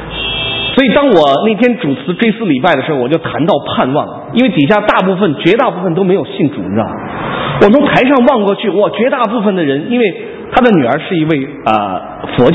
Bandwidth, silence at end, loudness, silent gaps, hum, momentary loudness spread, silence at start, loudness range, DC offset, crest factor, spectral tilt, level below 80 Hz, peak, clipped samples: 8 kHz; 0 s; -11 LUFS; none; none; 8 LU; 0 s; 2 LU; under 0.1%; 12 dB; -8 dB/octave; -40 dBFS; 0 dBFS; 0.3%